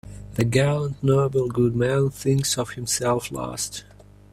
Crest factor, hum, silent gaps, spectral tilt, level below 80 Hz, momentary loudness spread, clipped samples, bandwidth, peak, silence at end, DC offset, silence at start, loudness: 18 dB; 50 Hz at -45 dBFS; none; -5 dB/octave; -48 dBFS; 9 LU; under 0.1%; 15 kHz; -6 dBFS; 0.5 s; under 0.1%; 0.05 s; -23 LUFS